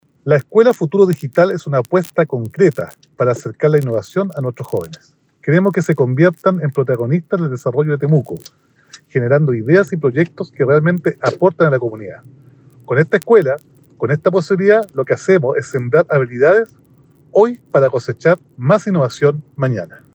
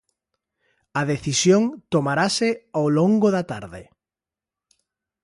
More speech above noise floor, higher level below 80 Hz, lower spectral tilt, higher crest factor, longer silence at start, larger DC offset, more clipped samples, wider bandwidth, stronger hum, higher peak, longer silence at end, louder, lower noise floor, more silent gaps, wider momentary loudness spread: second, 34 dB vs 69 dB; second, -64 dBFS vs -58 dBFS; first, -8 dB/octave vs -5 dB/octave; about the same, 16 dB vs 18 dB; second, 0.25 s vs 0.95 s; neither; neither; first, over 20 kHz vs 11.5 kHz; neither; first, 0 dBFS vs -6 dBFS; second, 0.3 s vs 1.4 s; first, -15 LUFS vs -21 LUFS; second, -49 dBFS vs -90 dBFS; neither; second, 9 LU vs 12 LU